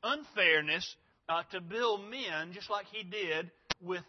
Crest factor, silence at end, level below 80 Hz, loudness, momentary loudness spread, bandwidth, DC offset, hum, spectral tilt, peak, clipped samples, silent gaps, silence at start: 26 dB; 0.05 s; -72 dBFS; -33 LUFS; 13 LU; 6.2 kHz; under 0.1%; none; -0.5 dB/octave; -8 dBFS; under 0.1%; none; 0.05 s